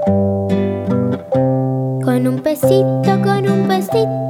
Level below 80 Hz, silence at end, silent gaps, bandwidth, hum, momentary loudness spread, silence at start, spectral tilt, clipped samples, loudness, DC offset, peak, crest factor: -54 dBFS; 0 s; none; 17 kHz; none; 4 LU; 0 s; -7.5 dB/octave; under 0.1%; -16 LUFS; under 0.1%; 0 dBFS; 14 dB